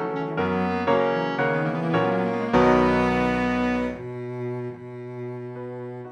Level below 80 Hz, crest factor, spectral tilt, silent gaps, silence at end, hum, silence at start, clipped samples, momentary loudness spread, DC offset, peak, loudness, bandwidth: -46 dBFS; 18 dB; -7.5 dB/octave; none; 0 s; none; 0 s; under 0.1%; 15 LU; under 0.1%; -6 dBFS; -23 LUFS; 9.2 kHz